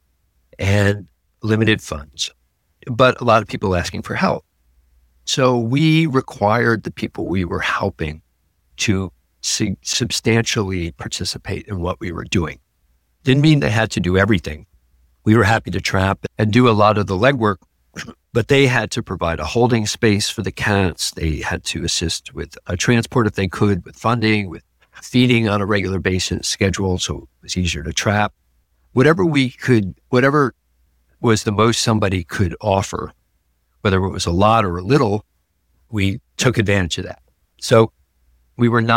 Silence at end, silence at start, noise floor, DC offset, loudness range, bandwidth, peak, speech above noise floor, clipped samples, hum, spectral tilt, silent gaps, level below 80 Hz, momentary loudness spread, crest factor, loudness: 0 s; 0.6 s; -65 dBFS; under 0.1%; 4 LU; 16.5 kHz; -2 dBFS; 47 dB; under 0.1%; none; -5 dB/octave; none; -40 dBFS; 12 LU; 18 dB; -18 LUFS